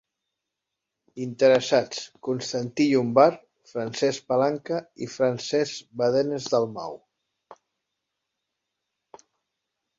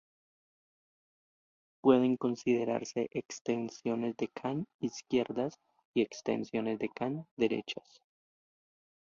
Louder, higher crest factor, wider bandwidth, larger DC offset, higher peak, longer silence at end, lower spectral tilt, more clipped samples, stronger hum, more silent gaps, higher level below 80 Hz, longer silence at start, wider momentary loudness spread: first, -24 LUFS vs -34 LUFS; about the same, 22 dB vs 22 dB; about the same, 7.8 kHz vs 7.4 kHz; neither; first, -4 dBFS vs -12 dBFS; first, 2.45 s vs 1.25 s; about the same, -5 dB/octave vs -5.5 dB/octave; neither; neither; second, none vs 3.41-3.45 s, 4.74-4.79 s, 5.85-5.94 s, 7.31-7.37 s; about the same, -70 dBFS vs -74 dBFS; second, 1.15 s vs 1.85 s; first, 17 LU vs 10 LU